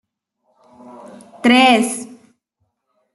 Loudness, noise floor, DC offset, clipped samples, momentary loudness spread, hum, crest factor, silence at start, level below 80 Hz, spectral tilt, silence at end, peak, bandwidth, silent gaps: -13 LUFS; -71 dBFS; under 0.1%; under 0.1%; 18 LU; none; 18 dB; 1.45 s; -64 dBFS; -3 dB/octave; 1.1 s; -2 dBFS; 12.5 kHz; none